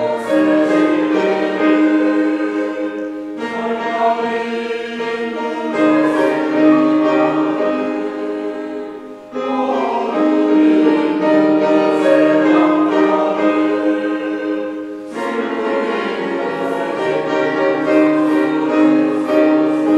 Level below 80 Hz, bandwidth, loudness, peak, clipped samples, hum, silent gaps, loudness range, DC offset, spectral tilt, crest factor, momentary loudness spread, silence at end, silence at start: -64 dBFS; 8.8 kHz; -16 LUFS; 0 dBFS; under 0.1%; none; none; 6 LU; under 0.1%; -6 dB/octave; 14 dB; 10 LU; 0 s; 0 s